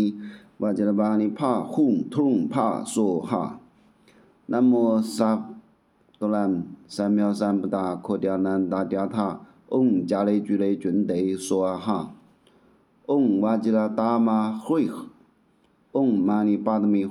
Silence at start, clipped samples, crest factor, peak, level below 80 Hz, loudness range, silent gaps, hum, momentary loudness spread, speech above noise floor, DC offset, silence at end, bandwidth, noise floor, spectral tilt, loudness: 0 s; under 0.1%; 18 dB; -6 dBFS; -72 dBFS; 2 LU; none; none; 8 LU; 40 dB; under 0.1%; 0 s; 13 kHz; -63 dBFS; -7 dB/octave; -24 LUFS